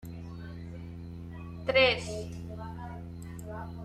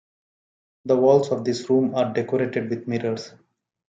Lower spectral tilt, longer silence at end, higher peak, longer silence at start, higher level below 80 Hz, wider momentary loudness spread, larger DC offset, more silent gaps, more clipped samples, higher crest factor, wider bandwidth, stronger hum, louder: second, -5 dB/octave vs -6.5 dB/octave; second, 0 s vs 0.65 s; second, -12 dBFS vs -4 dBFS; second, 0 s vs 0.85 s; first, -52 dBFS vs -70 dBFS; first, 19 LU vs 12 LU; neither; neither; neither; about the same, 22 dB vs 18 dB; first, 14 kHz vs 7.8 kHz; neither; second, -30 LUFS vs -22 LUFS